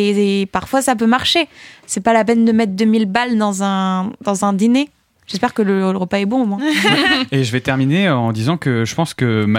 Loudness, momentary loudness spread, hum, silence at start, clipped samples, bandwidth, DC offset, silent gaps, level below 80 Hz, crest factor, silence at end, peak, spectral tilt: -16 LUFS; 6 LU; none; 0 s; under 0.1%; 16 kHz; under 0.1%; none; -52 dBFS; 14 dB; 0 s; -2 dBFS; -5 dB/octave